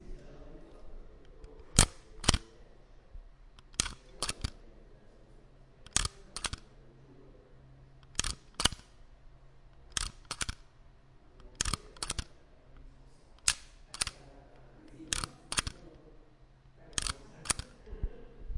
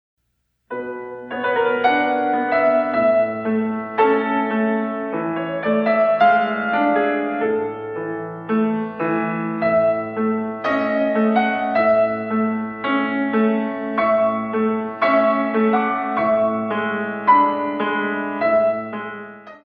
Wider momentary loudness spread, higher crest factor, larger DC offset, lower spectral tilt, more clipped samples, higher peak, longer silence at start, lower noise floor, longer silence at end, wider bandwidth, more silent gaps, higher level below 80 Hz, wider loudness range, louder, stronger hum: first, 25 LU vs 9 LU; first, 36 dB vs 16 dB; neither; second, -2 dB/octave vs -8.5 dB/octave; neither; about the same, -2 dBFS vs -2 dBFS; second, 0 s vs 0.7 s; second, -59 dBFS vs -71 dBFS; about the same, 0 s vs 0.1 s; first, 11.5 kHz vs 5.4 kHz; neither; first, -44 dBFS vs -62 dBFS; first, 7 LU vs 3 LU; second, -34 LUFS vs -19 LUFS; neither